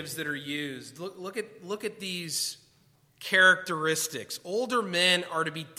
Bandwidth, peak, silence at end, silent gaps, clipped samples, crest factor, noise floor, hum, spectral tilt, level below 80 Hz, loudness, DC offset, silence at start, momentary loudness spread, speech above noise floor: 16.5 kHz; -8 dBFS; 0.05 s; none; under 0.1%; 20 dB; -64 dBFS; none; -2 dB/octave; -78 dBFS; -27 LUFS; under 0.1%; 0 s; 17 LU; 35 dB